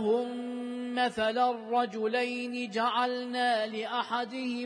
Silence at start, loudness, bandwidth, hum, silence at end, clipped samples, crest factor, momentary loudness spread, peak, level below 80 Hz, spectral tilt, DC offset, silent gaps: 0 s; -31 LUFS; 10.5 kHz; none; 0 s; under 0.1%; 14 dB; 6 LU; -16 dBFS; -74 dBFS; -4 dB/octave; under 0.1%; none